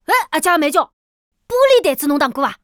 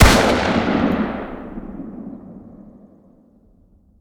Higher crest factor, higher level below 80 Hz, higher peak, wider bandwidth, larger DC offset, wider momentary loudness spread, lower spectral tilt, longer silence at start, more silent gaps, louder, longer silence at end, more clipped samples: second, 14 dB vs 20 dB; second, -56 dBFS vs -28 dBFS; about the same, -2 dBFS vs 0 dBFS; about the same, 20 kHz vs over 20 kHz; neither; second, 7 LU vs 24 LU; second, -2 dB/octave vs -5 dB/octave; about the same, 0.1 s vs 0 s; first, 0.93-1.32 s vs none; first, -15 LUFS vs -18 LUFS; second, 0.1 s vs 1.4 s; neither